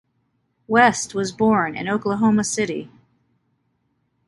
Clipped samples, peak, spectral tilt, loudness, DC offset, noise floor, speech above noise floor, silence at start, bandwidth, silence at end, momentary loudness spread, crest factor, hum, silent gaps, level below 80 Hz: under 0.1%; -2 dBFS; -4.5 dB/octave; -20 LUFS; under 0.1%; -69 dBFS; 50 dB; 0.7 s; 11.5 kHz; 1.4 s; 9 LU; 20 dB; none; none; -56 dBFS